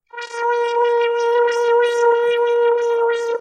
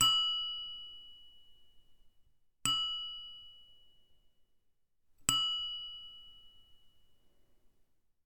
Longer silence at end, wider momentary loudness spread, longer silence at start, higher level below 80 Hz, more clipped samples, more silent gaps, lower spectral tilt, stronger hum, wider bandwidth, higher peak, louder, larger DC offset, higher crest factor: second, 0 s vs 1.4 s; second, 4 LU vs 23 LU; first, 0.15 s vs 0 s; second, -76 dBFS vs -66 dBFS; neither; neither; about the same, 0 dB/octave vs 0.5 dB/octave; neither; second, 9.6 kHz vs 18.5 kHz; first, -6 dBFS vs -10 dBFS; first, -17 LUFS vs -33 LUFS; neither; second, 12 dB vs 30 dB